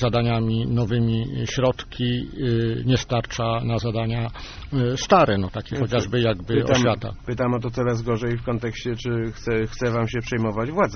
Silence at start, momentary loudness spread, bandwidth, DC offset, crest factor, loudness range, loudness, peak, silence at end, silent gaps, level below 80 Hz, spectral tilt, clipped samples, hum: 0 s; 7 LU; 6.6 kHz; under 0.1%; 20 dB; 3 LU; -23 LUFS; -4 dBFS; 0 s; none; -40 dBFS; -5.5 dB/octave; under 0.1%; none